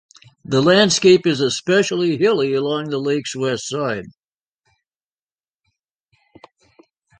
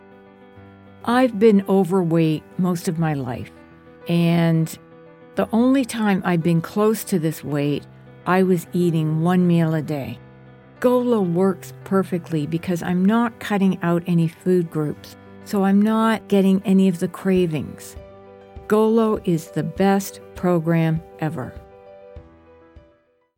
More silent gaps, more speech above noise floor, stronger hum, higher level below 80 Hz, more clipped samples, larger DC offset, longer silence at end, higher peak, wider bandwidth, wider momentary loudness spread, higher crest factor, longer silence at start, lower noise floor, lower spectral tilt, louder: neither; first, over 73 dB vs 40 dB; neither; second, -60 dBFS vs -54 dBFS; neither; neither; first, 3.1 s vs 0.6 s; about the same, -2 dBFS vs -4 dBFS; second, 10 kHz vs 17 kHz; second, 10 LU vs 13 LU; about the same, 18 dB vs 16 dB; about the same, 0.5 s vs 0.55 s; first, under -90 dBFS vs -60 dBFS; second, -4.5 dB/octave vs -7.5 dB/octave; first, -17 LUFS vs -20 LUFS